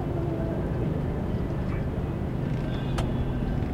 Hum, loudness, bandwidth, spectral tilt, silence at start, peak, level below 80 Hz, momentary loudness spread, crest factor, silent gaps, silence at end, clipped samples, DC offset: none; -29 LUFS; 12.5 kHz; -8.5 dB/octave; 0 s; -14 dBFS; -34 dBFS; 2 LU; 14 dB; none; 0 s; under 0.1%; under 0.1%